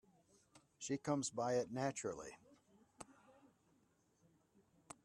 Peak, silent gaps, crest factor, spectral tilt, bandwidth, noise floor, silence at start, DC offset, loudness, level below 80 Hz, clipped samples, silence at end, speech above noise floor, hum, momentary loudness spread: -24 dBFS; none; 22 dB; -4.5 dB/octave; 12.5 kHz; -77 dBFS; 0.55 s; under 0.1%; -42 LUFS; -80 dBFS; under 0.1%; 1.75 s; 35 dB; none; 20 LU